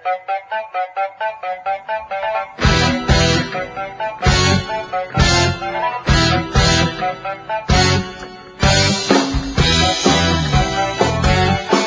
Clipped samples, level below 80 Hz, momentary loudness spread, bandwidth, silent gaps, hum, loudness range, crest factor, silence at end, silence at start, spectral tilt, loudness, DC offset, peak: under 0.1%; -26 dBFS; 10 LU; 8 kHz; none; none; 3 LU; 16 dB; 0 s; 0.05 s; -4 dB/octave; -16 LUFS; under 0.1%; 0 dBFS